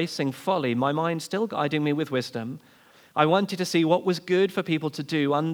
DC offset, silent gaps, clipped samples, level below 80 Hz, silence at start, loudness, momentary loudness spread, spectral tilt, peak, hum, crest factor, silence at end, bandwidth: under 0.1%; none; under 0.1%; -82 dBFS; 0 s; -25 LUFS; 7 LU; -6 dB/octave; -4 dBFS; none; 20 dB; 0 s; over 20 kHz